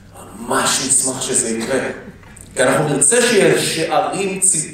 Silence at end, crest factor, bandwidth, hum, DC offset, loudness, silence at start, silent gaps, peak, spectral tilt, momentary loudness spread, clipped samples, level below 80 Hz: 0 s; 16 dB; 16 kHz; none; under 0.1%; -15 LUFS; 0.15 s; none; 0 dBFS; -2.5 dB/octave; 9 LU; under 0.1%; -50 dBFS